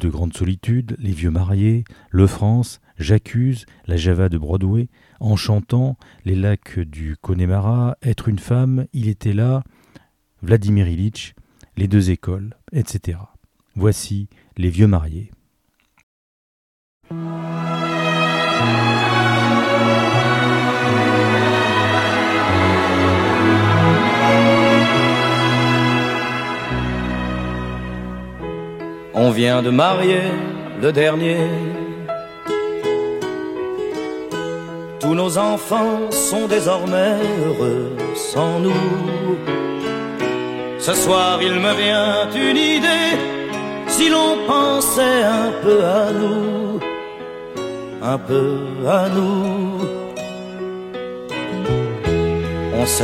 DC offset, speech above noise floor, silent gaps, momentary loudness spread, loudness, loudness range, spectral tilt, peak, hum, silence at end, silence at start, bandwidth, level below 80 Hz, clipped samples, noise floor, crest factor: under 0.1%; 47 dB; 16.03-17.01 s; 13 LU; -18 LUFS; 7 LU; -5 dB/octave; -2 dBFS; none; 0 s; 0 s; 16.5 kHz; -40 dBFS; under 0.1%; -65 dBFS; 16 dB